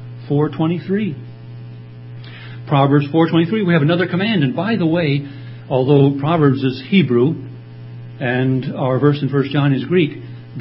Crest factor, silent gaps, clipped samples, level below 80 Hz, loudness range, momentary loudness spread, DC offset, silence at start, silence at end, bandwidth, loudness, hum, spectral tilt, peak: 16 dB; none; under 0.1%; -56 dBFS; 3 LU; 20 LU; under 0.1%; 0 s; 0 s; 5.8 kHz; -17 LUFS; none; -12.5 dB/octave; 0 dBFS